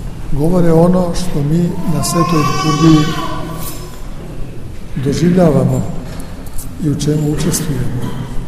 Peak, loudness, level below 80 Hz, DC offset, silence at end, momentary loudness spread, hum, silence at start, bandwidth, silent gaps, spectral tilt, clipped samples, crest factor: 0 dBFS; -14 LUFS; -26 dBFS; under 0.1%; 0 s; 19 LU; none; 0 s; 15.5 kHz; none; -6 dB/octave; 0.1%; 14 dB